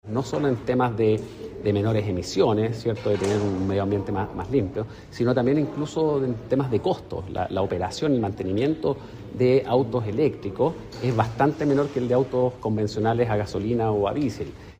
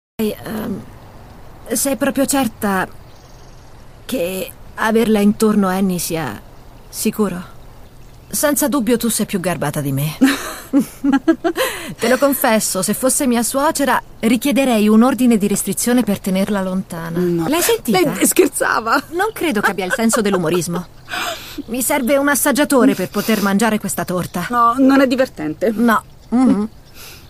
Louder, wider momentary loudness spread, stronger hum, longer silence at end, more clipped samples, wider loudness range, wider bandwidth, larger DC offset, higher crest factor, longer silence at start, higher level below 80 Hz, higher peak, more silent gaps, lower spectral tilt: second, -24 LUFS vs -16 LUFS; second, 7 LU vs 10 LU; neither; about the same, 0.05 s vs 0 s; neither; second, 2 LU vs 5 LU; about the same, 15 kHz vs 15.5 kHz; neither; about the same, 18 dB vs 16 dB; second, 0.05 s vs 0.2 s; about the same, -48 dBFS vs -44 dBFS; second, -6 dBFS vs 0 dBFS; neither; first, -7.5 dB/octave vs -4.5 dB/octave